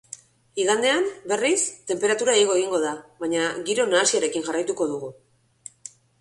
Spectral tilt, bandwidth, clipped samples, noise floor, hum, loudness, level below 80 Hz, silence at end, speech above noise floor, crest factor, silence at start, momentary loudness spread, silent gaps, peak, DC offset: -2 dB/octave; 11.5 kHz; under 0.1%; -48 dBFS; none; -23 LUFS; -70 dBFS; 0.35 s; 25 dB; 18 dB; 0.1 s; 21 LU; none; -6 dBFS; under 0.1%